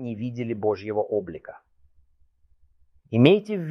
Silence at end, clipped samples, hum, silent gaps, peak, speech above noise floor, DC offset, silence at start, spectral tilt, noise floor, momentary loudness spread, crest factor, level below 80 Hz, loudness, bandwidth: 0 s; under 0.1%; none; none; -4 dBFS; 37 dB; under 0.1%; 0 s; -8.5 dB/octave; -61 dBFS; 21 LU; 22 dB; -62 dBFS; -23 LUFS; 6.4 kHz